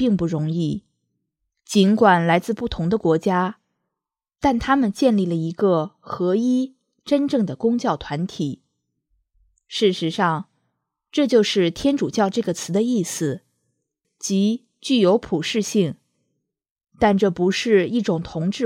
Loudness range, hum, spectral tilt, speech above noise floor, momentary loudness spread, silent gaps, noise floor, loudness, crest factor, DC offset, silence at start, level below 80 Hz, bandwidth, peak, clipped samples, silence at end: 4 LU; none; -5.5 dB/octave; 66 dB; 10 LU; 16.71-16.76 s; -86 dBFS; -21 LUFS; 18 dB; under 0.1%; 0 s; -50 dBFS; 15 kHz; -2 dBFS; under 0.1%; 0 s